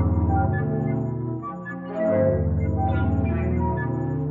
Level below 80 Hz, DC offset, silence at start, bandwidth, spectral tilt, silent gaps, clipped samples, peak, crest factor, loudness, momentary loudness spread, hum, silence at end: -36 dBFS; under 0.1%; 0 s; 3.7 kHz; -11.5 dB/octave; none; under 0.1%; -10 dBFS; 14 dB; -24 LUFS; 9 LU; none; 0 s